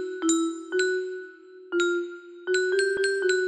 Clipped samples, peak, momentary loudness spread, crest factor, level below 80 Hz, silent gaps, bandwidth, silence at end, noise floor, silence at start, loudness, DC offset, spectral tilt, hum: under 0.1%; -10 dBFS; 14 LU; 16 dB; -72 dBFS; none; 9.6 kHz; 0 s; -45 dBFS; 0 s; -26 LUFS; under 0.1%; -1 dB/octave; none